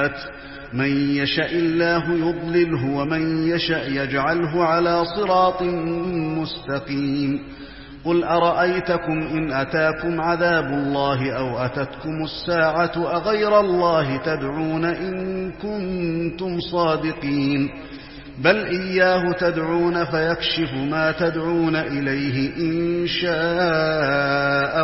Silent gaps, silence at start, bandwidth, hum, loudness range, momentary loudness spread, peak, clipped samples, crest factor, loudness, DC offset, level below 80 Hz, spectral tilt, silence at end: none; 0 s; 5.8 kHz; none; 3 LU; 8 LU; -2 dBFS; under 0.1%; 18 dB; -21 LUFS; 0.2%; -46 dBFS; -9.5 dB/octave; 0 s